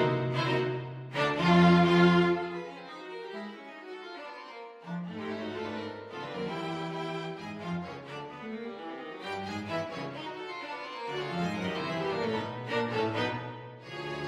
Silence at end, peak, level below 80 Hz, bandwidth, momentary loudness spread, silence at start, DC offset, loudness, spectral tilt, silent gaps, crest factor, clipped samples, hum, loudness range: 0 s; -12 dBFS; -66 dBFS; 8.6 kHz; 19 LU; 0 s; under 0.1%; -31 LUFS; -7 dB/octave; none; 20 dB; under 0.1%; none; 13 LU